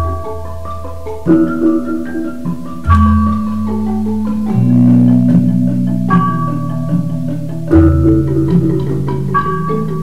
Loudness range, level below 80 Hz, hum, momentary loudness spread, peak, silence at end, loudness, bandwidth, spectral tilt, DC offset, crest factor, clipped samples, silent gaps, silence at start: 3 LU; -26 dBFS; none; 13 LU; 0 dBFS; 0 s; -13 LUFS; 13 kHz; -9.5 dB/octave; 6%; 14 dB; under 0.1%; none; 0 s